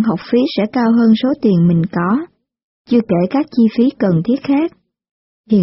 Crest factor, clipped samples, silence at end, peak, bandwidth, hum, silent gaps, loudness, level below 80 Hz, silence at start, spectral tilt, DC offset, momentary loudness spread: 12 dB; under 0.1%; 0 s; -2 dBFS; 5.8 kHz; none; 2.63-2.85 s, 5.11-5.44 s; -15 LUFS; -52 dBFS; 0 s; -7 dB/octave; under 0.1%; 5 LU